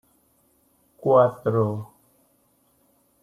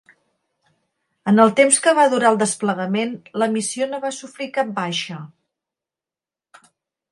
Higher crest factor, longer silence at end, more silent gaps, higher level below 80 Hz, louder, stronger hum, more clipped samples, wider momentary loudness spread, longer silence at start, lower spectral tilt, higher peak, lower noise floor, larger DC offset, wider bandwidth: about the same, 22 dB vs 20 dB; second, 1.4 s vs 1.85 s; neither; first, -66 dBFS vs -72 dBFS; second, -22 LUFS vs -18 LUFS; neither; neither; about the same, 16 LU vs 14 LU; second, 1.05 s vs 1.25 s; first, -9.5 dB/octave vs -3.5 dB/octave; second, -4 dBFS vs 0 dBFS; second, -64 dBFS vs under -90 dBFS; neither; first, 14.5 kHz vs 11.5 kHz